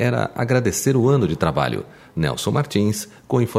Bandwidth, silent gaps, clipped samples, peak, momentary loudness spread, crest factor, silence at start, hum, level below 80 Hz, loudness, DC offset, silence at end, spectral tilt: 16 kHz; none; under 0.1%; -2 dBFS; 7 LU; 18 dB; 0 s; none; -46 dBFS; -20 LUFS; under 0.1%; 0 s; -5.5 dB/octave